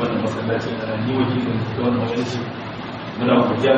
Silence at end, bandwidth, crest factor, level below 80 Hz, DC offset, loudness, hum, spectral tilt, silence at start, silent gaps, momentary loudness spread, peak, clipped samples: 0 s; 8 kHz; 18 dB; -52 dBFS; under 0.1%; -22 LUFS; none; -5.5 dB/octave; 0 s; none; 12 LU; -2 dBFS; under 0.1%